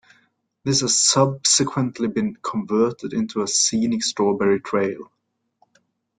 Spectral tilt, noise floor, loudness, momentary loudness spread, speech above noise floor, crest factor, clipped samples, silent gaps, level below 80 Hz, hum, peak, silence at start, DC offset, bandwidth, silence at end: -3.5 dB/octave; -65 dBFS; -20 LUFS; 10 LU; 44 dB; 18 dB; under 0.1%; none; -60 dBFS; none; -4 dBFS; 0.65 s; under 0.1%; 11 kHz; 1.15 s